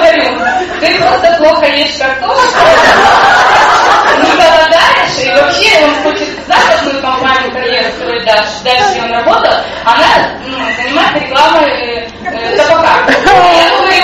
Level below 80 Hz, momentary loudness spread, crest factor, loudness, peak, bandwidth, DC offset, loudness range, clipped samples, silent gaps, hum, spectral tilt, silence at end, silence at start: -36 dBFS; 8 LU; 8 dB; -7 LUFS; 0 dBFS; 15 kHz; under 0.1%; 4 LU; under 0.1%; none; none; -2.5 dB/octave; 0 s; 0 s